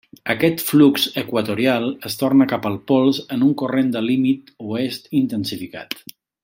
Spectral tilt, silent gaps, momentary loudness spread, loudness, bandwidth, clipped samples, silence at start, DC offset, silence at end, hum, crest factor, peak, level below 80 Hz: -5.5 dB/octave; none; 12 LU; -19 LUFS; 16.5 kHz; under 0.1%; 0.25 s; under 0.1%; 0.45 s; none; 16 dB; -2 dBFS; -62 dBFS